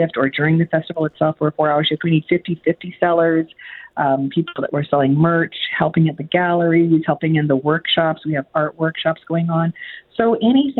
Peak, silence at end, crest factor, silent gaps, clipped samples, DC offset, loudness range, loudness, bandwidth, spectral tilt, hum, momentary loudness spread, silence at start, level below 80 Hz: -2 dBFS; 0 s; 14 dB; none; under 0.1%; under 0.1%; 2 LU; -18 LUFS; 4.2 kHz; -10.5 dB/octave; none; 7 LU; 0 s; -58 dBFS